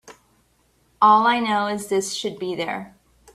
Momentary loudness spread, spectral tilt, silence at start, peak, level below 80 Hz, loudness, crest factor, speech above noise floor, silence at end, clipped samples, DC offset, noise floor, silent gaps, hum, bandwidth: 13 LU; -3.5 dB/octave; 0.05 s; -2 dBFS; -64 dBFS; -20 LUFS; 20 dB; 42 dB; 0.45 s; under 0.1%; under 0.1%; -63 dBFS; none; none; 14.5 kHz